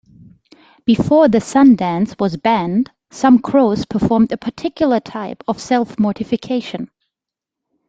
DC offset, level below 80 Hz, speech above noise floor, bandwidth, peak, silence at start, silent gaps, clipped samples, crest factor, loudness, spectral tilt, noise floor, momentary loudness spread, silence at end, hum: under 0.1%; -48 dBFS; 70 dB; 9 kHz; -2 dBFS; 0.85 s; none; under 0.1%; 14 dB; -16 LUFS; -6.5 dB/octave; -85 dBFS; 13 LU; 1.05 s; none